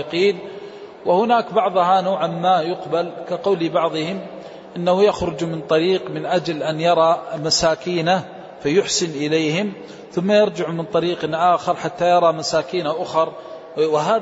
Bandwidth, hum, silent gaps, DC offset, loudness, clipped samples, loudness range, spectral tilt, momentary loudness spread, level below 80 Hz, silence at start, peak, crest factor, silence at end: 8 kHz; none; none; under 0.1%; -19 LUFS; under 0.1%; 2 LU; -4.5 dB/octave; 11 LU; -54 dBFS; 0 s; -4 dBFS; 16 dB; 0 s